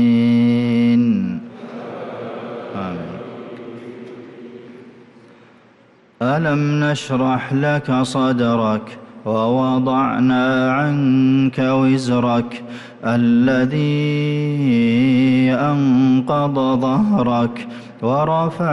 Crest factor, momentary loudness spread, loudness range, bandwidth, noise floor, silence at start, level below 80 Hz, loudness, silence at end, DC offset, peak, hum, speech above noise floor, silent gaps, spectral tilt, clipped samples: 10 dB; 18 LU; 15 LU; 10.5 kHz; -51 dBFS; 0 s; -54 dBFS; -17 LUFS; 0 s; under 0.1%; -8 dBFS; none; 35 dB; none; -7.5 dB/octave; under 0.1%